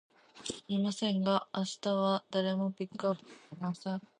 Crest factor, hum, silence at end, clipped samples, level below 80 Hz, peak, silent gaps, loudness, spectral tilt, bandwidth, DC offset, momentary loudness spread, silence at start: 18 dB; none; 0.2 s; under 0.1%; -76 dBFS; -16 dBFS; none; -34 LUFS; -5.5 dB/octave; 10 kHz; under 0.1%; 11 LU; 0.35 s